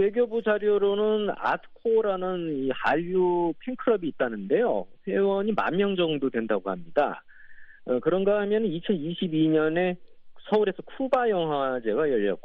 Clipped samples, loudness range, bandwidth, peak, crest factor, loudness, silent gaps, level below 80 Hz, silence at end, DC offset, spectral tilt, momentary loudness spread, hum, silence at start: under 0.1%; 1 LU; 5.4 kHz; -10 dBFS; 16 dB; -26 LUFS; none; -60 dBFS; 0.05 s; under 0.1%; -4.5 dB/octave; 6 LU; none; 0 s